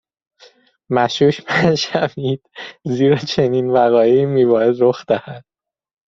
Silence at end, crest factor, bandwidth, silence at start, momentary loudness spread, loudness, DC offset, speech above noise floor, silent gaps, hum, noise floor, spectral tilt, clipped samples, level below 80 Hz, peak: 0.7 s; 16 dB; 7.6 kHz; 0.9 s; 10 LU; -16 LUFS; under 0.1%; 34 dB; none; none; -50 dBFS; -6 dB/octave; under 0.1%; -56 dBFS; -2 dBFS